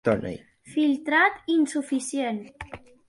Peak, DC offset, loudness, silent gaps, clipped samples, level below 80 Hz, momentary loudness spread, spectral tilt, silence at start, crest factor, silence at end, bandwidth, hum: -8 dBFS; under 0.1%; -25 LUFS; none; under 0.1%; -56 dBFS; 20 LU; -4.5 dB/octave; 0.05 s; 18 dB; 0.3 s; 11.5 kHz; none